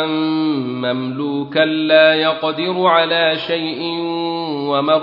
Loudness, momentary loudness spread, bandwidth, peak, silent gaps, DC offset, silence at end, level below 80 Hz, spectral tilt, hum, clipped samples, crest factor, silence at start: -16 LUFS; 10 LU; 5.6 kHz; 0 dBFS; none; under 0.1%; 0 s; -64 dBFS; -8 dB/octave; none; under 0.1%; 16 dB; 0 s